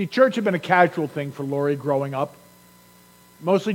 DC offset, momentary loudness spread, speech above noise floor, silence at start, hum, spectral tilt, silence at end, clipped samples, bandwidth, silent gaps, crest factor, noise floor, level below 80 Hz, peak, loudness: under 0.1%; 11 LU; 30 dB; 0 s; 60 Hz at -55 dBFS; -6.5 dB/octave; 0 s; under 0.1%; 17 kHz; none; 20 dB; -52 dBFS; -70 dBFS; -2 dBFS; -22 LUFS